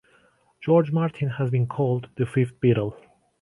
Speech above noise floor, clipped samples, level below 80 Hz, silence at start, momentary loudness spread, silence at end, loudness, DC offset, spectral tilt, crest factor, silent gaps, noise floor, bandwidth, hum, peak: 38 dB; under 0.1%; -58 dBFS; 0.6 s; 6 LU; 0.45 s; -24 LUFS; under 0.1%; -9.5 dB/octave; 18 dB; none; -61 dBFS; 11 kHz; none; -6 dBFS